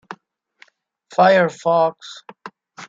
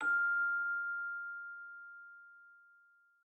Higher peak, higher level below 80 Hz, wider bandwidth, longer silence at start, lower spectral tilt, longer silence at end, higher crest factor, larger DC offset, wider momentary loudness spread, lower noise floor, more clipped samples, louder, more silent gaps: first, -2 dBFS vs -26 dBFS; first, -70 dBFS vs under -90 dBFS; about the same, 7.8 kHz vs 8.2 kHz; about the same, 0.1 s vs 0 s; first, -5.5 dB/octave vs -2 dB/octave; second, 0.05 s vs 0.65 s; first, 18 dB vs 12 dB; neither; about the same, 25 LU vs 23 LU; second, -54 dBFS vs -68 dBFS; neither; first, -17 LUFS vs -36 LUFS; neither